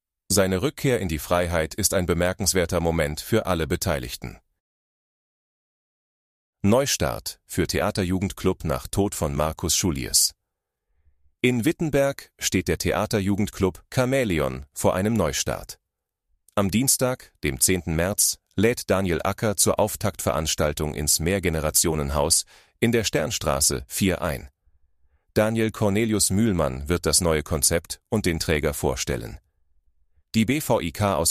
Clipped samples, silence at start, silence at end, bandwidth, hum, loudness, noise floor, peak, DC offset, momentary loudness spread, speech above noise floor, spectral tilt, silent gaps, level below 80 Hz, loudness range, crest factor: under 0.1%; 0.3 s; 0 s; 15.5 kHz; none; -23 LUFS; -82 dBFS; -4 dBFS; under 0.1%; 7 LU; 59 dB; -4 dB/octave; 4.60-6.53 s; -40 dBFS; 4 LU; 20 dB